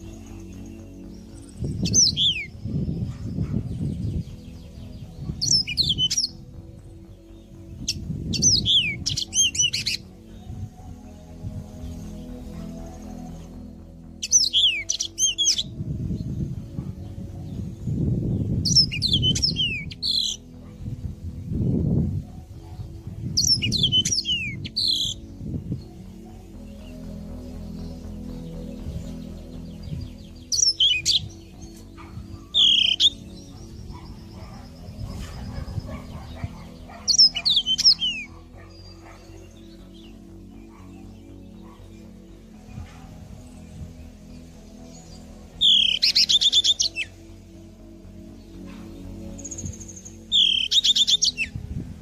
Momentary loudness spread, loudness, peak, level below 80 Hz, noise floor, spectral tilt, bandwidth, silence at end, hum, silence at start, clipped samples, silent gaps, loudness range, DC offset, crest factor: 26 LU; -20 LUFS; -6 dBFS; -42 dBFS; -44 dBFS; -2 dB/octave; 15.5 kHz; 0 s; none; 0 s; under 0.1%; none; 18 LU; under 0.1%; 20 dB